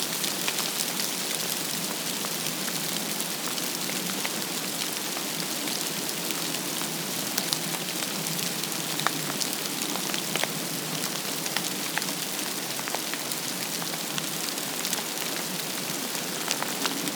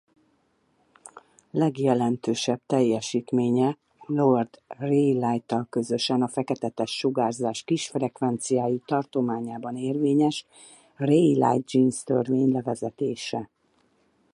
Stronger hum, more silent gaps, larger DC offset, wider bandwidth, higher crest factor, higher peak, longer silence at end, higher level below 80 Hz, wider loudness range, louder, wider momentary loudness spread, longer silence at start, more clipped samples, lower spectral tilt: neither; neither; neither; first, over 20 kHz vs 11.5 kHz; first, 28 dB vs 16 dB; first, -2 dBFS vs -8 dBFS; second, 0 s vs 0.9 s; second, -82 dBFS vs -70 dBFS; about the same, 1 LU vs 3 LU; second, -28 LUFS vs -25 LUFS; second, 2 LU vs 9 LU; second, 0 s vs 1.05 s; neither; second, -1.5 dB/octave vs -6 dB/octave